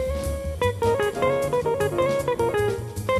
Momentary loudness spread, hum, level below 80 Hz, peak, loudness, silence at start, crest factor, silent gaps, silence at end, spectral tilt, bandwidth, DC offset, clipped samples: 5 LU; none; -38 dBFS; -10 dBFS; -24 LUFS; 0 s; 14 dB; none; 0 s; -5.5 dB/octave; 13 kHz; under 0.1%; under 0.1%